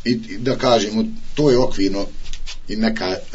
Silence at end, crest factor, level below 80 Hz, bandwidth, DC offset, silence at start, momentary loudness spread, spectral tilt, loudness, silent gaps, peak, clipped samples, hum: 0 s; 18 dB; -30 dBFS; 8 kHz; under 0.1%; 0 s; 15 LU; -5.5 dB/octave; -19 LUFS; none; -2 dBFS; under 0.1%; none